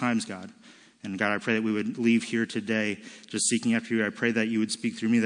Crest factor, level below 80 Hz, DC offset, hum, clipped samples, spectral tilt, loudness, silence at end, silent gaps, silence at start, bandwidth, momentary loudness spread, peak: 18 dB; -78 dBFS; under 0.1%; none; under 0.1%; -4 dB/octave; -27 LUFS; 0 s; none; 0 s; 10.5 kHz; 13 LU; -10 dBFS